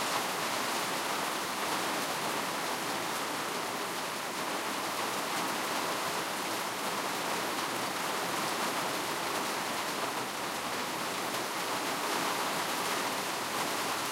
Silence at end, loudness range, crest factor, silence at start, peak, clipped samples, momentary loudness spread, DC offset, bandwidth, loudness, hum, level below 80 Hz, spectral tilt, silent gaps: 0 s; 1 LU; 16 dB; 0 s; -18 dBFS; under 0.1%; 2 LU; under 0.1%; 16 kHz; -32 LUFS; none; -74 dBFS; -1.5 dB/octave; none